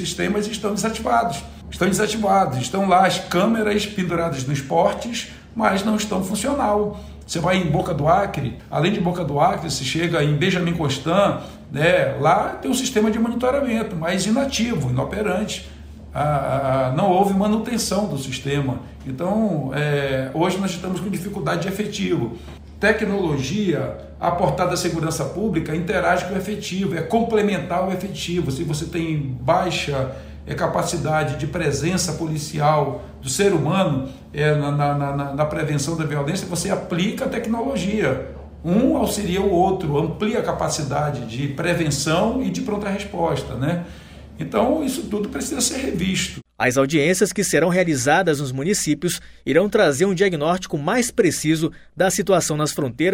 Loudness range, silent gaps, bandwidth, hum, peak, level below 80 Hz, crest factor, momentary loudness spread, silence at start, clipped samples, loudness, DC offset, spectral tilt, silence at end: 4 LU; none; 16 kHz; none; -4 dBFS; -42 dBFS; 18 dB; 8 LU; 0 s; under 0.1%; -21 LUFS; under 0.1%; -5 dB/octave; 0 s